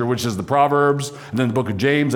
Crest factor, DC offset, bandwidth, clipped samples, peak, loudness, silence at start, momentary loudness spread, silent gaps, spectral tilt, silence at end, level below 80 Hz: 14 dB; under 0.1%; 18.5 kHz; under 0.1%; -4 dBFS; -19 LUFS; 0 s; 7 LU; none; -6 dB/octave; 0 s; -56 dBFS